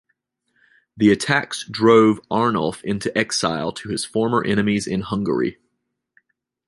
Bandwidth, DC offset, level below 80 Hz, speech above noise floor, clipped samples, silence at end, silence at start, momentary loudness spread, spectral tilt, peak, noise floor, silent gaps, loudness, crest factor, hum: 11.5 kHz; under 0.1%; -54 dBFS; 57 dB; under 0.1%; 1.15 s; 0.95 s; 11 LU; -5 dB/octave; -2 dBFS; -76 dBFS; none; -20 LUFS; 20 dB; none